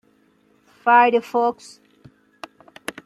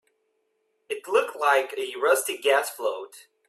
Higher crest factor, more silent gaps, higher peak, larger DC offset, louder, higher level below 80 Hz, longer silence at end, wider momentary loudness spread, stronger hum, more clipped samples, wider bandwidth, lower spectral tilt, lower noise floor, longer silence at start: about the same, 20 dB vs 20 dB; neither; first, -2 dBFS vs -8 dBFS; neither; first, -18 LUFS vs -24 LUFS; first, -70 dBFS vs -78 dBFS; first, 1.55 s vs 0.3 s; first, 27 LU vs 13 LU; neither; neither; about the same, 14.5 kHz vs 15 kHz; first, -4 dB/octave vs 0.5 dB/octave; second, -60 dBFS vs -73 dBFS; about the same, 0.85 s vs 0.9 s